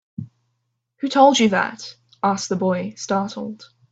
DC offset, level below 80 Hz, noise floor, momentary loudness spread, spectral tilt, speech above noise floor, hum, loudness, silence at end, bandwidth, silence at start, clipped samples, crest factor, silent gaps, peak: under 0.1%; -64 dBFS; -74 dBFS; 22 LU; -4.5 dB/octave; 54 dB; none; -20 LUFS; 0.25 s; 8.4 kHz; 0.2 s; under 0.1%; 20 dB; none; -2 dBFS